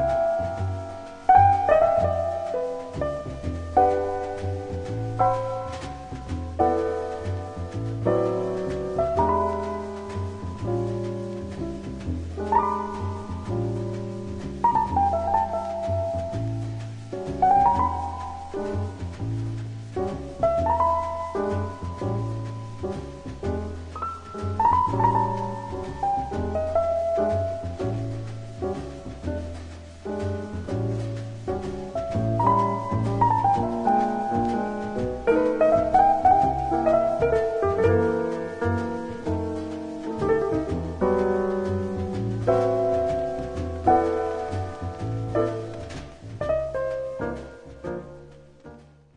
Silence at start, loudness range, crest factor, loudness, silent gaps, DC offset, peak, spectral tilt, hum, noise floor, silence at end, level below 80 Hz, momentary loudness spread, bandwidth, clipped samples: 0 s; 8 LU; 20 dB; -25 LUFS; none; under 0.1%; -4 dBFS; -8 dB/octave; none; -47 dBFS; 0.3 s; -44 dBFS; 13 LU; 10.5 kHz; under 0.1%